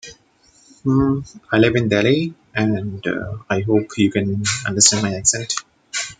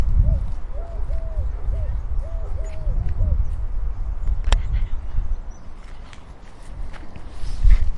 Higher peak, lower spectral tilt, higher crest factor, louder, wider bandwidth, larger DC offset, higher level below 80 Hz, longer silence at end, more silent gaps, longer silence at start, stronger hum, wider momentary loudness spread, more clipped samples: about the same, 0 dBFS vs 0 dBFS; second, -4 dB/octave vs -6.5 dB/octave; about the same, 18 dB vs 20 dB; first, -18 LUFS vs -27 LUFS; first, 13.5 kHz vs 8 kHz; neither; second, -48 dBFS vs -22 dBFS; about the same, 0.05 s vs 0 s; neither; about the same, 0.05 s vs 0 s; neither; second, 12 LU vs 19 LU; neither